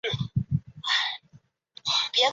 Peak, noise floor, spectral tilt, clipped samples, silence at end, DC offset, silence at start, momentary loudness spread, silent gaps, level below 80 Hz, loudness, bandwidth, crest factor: -10 dBFS; -58 dBFS; -3.5 dB/octave; under 0.1%; 0 s; under 0.1%; 0.05 s; 9 LU; none; -52 dBFS; -26 LUFS; 8 kHz; 18 dB